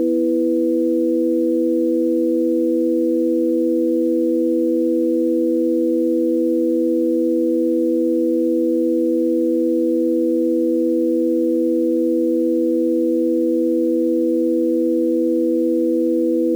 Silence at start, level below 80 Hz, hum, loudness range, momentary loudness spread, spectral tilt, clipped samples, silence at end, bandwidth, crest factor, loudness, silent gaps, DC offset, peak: 0 s; -78 dBFS; none; 0 LU; 0 LU; -7.5 dB/octave; under 0.1%; 0 s; 0.5 kHz; 6 dB; -18 LUFS; none; under 0.1%; -10 dBFS